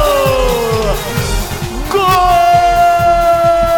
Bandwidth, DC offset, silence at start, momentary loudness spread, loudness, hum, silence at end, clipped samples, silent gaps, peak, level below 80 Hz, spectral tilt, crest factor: 18 kHz; under 0.1%; 0 s; 8 LU; -12 LUFS; none; 0 s; under 0.1%; none; 0 dBFS; -22 dBFS; -4.5 dB/octave; 10 dB